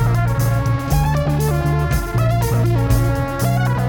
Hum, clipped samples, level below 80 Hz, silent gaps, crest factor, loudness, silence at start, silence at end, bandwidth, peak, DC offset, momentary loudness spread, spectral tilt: none; under 0.1%; -24 dBFS; none; 12 dB; -18 LUFS; 0 s; 0 s; 18 kHz; -4 dBFS; under 0.1%; 2 LU; -6.5 dB/octave